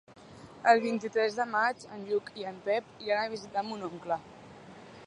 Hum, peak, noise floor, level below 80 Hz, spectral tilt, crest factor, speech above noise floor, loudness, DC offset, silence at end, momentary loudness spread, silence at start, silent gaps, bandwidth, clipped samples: none; -8 dBFS; -50 dBFS; -72 dBFS; -4.5 dB/octave; 24 dB; 20 dB; -31 LUFS; under 0.1%; 0 s; 25 LU; 0.1 s; none; 10.5 kHz; under 0.1%